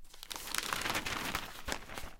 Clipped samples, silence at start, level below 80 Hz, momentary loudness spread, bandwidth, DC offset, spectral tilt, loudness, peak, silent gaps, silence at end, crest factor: under 0.1%; 0 s; -52 dBFS; 8 LU; 17 kHz; under 0.1%; -1.5 dB/octave; -37 LUFS; -10 dBFS; none; 0 s; 28 dB